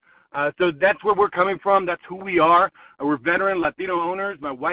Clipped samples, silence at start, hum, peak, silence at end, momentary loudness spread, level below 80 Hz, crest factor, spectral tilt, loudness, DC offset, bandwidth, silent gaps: under 0.1%; 0.35 s; none; -6 dBFS; 0 s; 11 LU; -58 dBFS; 16 dB; -9 dB/octave; -21 LUFS; under 0.1%; 4 kHz; none